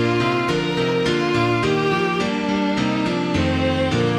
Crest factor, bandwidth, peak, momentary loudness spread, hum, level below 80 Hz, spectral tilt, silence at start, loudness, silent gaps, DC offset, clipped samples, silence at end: 12 dB; 12.5 kHz; -8 dBFS; 2 LU; none; -42 dBFS; -6 dB/octave; 0 s; -20 LUFS; none; under 0.1%; under 0.1%; 0 s